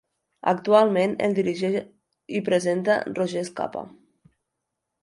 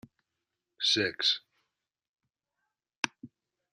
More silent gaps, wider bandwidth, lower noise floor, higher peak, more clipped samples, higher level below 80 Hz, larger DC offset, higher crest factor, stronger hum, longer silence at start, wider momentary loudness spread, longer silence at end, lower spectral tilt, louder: second, none vs 2.08-2.14 s, 2.97-3.03 s; second, 11.5 kHz vs 13 kHz; second, -82 dBFS vs -87 dBFS; about the same, -4 dBFS vs -6 dBFS; neither; first, -70 dBFS vs -80 dBFS; neither; second, 20 dB vs 30 dB; neither; second, 0.45 s vs 0.8 s; first, 13 LU vs 9 LU; first, 1.15 s vs 0.45 s; first, -6 dB/octave vs -1.5 dB/octave; first, -24 LUFS vs -29 LUFS